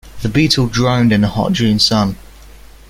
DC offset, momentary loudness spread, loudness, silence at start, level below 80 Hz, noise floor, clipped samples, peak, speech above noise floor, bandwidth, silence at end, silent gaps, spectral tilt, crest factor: under 0.1%; 6 LU; -14 LUFS; 0.05 s; -36 dBFS; -38 dBFS; under 0.1%; 0 dBFS; 25 dB; 16 kHz; 0.4 s; none; -5 dB/octave; 14 dB